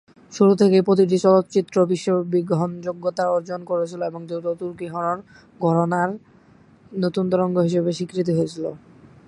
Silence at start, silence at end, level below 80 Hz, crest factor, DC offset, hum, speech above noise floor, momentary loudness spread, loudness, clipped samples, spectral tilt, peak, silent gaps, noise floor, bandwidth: 0.3 s; 0.5 s; -64 dBFS; 18 dB; under 0.1%; none; 31 dB; 13 LU; -21 LUFS; under 0.1%; -7.5 dB/octave; -4 dBFS; none; -52 dBFS; 11 kHz